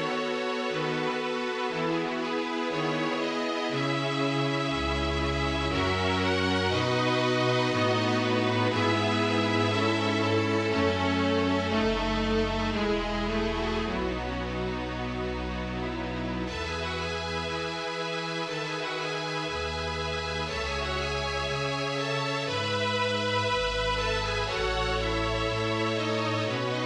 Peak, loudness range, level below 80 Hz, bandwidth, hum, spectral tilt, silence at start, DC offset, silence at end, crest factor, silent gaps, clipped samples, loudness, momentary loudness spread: -12 dBFS; 6 LU; -42 dBFS; 11.5 kHz; none; -5 dB/octave; 0 s; under 0.1%; 0 s; 16 dB; none; under 0.1%; -28 LUFS; 6 LU